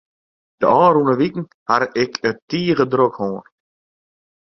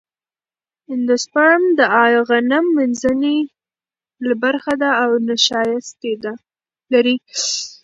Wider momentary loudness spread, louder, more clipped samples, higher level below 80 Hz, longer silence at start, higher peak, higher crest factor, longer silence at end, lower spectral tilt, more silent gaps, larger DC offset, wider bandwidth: about the same, 12 LU vs 12 LU; about the same, -18 LUFS vs -16 LUFS; neither; about the same, -58 dBFS vs -62 dBFS; second, 0.6 s vs 0.9 s; about the same, 0 dBFS vs 0 dBFS; about the same, 18 dB vs 18 dB; first, 1 s vs 0.1 s; first, -6.5 dB/octave vs -2.5 dB/octave; first, 1.54-1.66 s, 2.42-2.48 s vs none; neither; second, 6.4 kHz vs 8 kHz